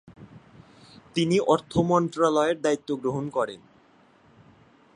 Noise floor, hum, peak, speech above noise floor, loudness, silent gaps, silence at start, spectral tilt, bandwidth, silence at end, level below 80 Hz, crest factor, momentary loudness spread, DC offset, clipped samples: -58 dBFS; none; -6 dBFS; 34 dB; -25 LUFS; none; 0.1 s; -6 dB/octave; 10.5 kHz; 1.4 s; -58 dBFS; 20 dB; 8 LU; under 0.1%; under 0.1%